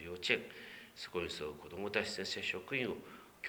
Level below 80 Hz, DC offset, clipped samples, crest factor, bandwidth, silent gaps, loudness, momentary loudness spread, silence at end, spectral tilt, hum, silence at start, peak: -68 dBFS; under 0.1%; under 0.1%; 26 dB; over 20 kHz; none; -39 LUFS; 14 LU; 0 s; -3.5 dB/octave; none; 0 s; -14 dBFS